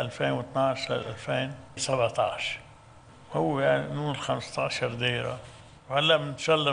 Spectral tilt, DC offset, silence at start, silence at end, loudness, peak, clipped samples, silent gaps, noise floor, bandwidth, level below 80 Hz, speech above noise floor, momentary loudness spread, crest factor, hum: -4.5 dB/octave; under 0.1%; 0 s; 0 s; -28 LUFS; -10 dBFS; under 0.1%; none; -52 dBFS; 10 kHz; -60 dBFS; 24 dB; 9 LU; 18 dB; none